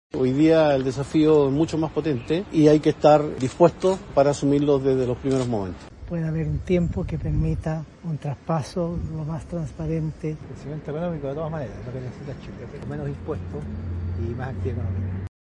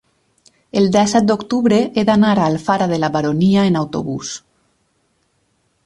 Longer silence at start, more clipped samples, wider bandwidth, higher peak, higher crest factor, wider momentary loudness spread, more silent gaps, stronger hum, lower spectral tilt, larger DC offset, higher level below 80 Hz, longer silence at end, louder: second, 0.15 s vs 0.75 s; neither; about the same, 11 kHz vs 11.5 kHz; about the same, -2 dBFS vs -2 dBFS; first, 20 dB vs 14 dB; first, 15 LU vs 10 LU; neither; neither; first, -7.5 dB/octave vs -6 dB/octave; neither; first, -42 dBFS vs -52 dBFS; second, 0.15 s vs 1.45 s; second, -23 LUFS vs -16 LUFS